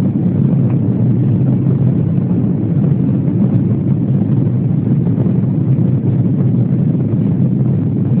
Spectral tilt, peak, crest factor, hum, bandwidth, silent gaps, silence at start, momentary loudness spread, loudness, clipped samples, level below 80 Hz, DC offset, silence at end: -15.5 dB/octave; 0 dBFS; 12 dB; none; 3.1 kHz; none; 0 s; 2 LU; -14 LUFS; under 0.1%; -40 dBFS; under 0.1%; 0 s